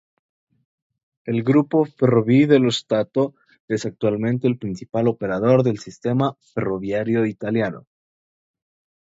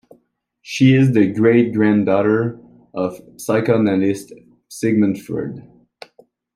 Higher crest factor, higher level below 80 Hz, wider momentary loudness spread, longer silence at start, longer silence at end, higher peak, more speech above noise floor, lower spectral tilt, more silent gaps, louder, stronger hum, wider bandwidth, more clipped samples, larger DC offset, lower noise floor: about the same, 20 dB vs 16 dB; about the same, -60 dBFS vs -60 dBFS; second, 11 LU vs 15 LU; first, 1.25 s vs 0.65 s; first, 1.25 s vs 0.95 s; about the same, -2 dBFS vs -2 dBFS; first, over 70 dB vs 45 dB; about the same, -7 dB/octave vs -7 dB/octave; first, 3.60-3.68 s vs none; second, -21 LUFS vs -17 LUFS; neither; second, 8 kHz vs 15 kHz; neither; neither; first, under -90 dBFS vs -62 dBFS